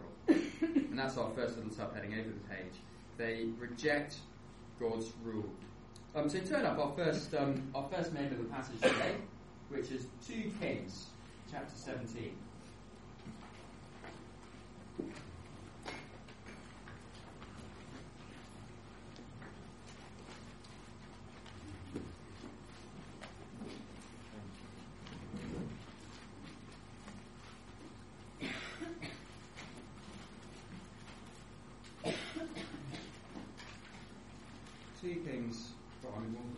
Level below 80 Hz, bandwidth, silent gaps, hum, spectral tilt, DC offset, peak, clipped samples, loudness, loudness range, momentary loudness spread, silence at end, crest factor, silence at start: -64 dBFS; 11.5 kHz; none; none; -5.5 dB/octave; under 0.1%; -16 dBFS; under 0.1%; -42 LUFS; 14 LU; 19 LU; 0 s; 26 dB; 0 s